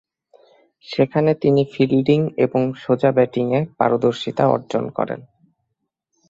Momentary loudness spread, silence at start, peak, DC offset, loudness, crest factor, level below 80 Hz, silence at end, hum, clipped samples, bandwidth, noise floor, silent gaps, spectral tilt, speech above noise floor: 8 LU; 0.9 s; -2 dBFS; under 0.1%; -19 LUFS; 18 dB; -58 dBFS; 1.1 s; none; under 0.1%; 7.8 kHz; -76 dBFS; none; -8 dB/octave; 58 dB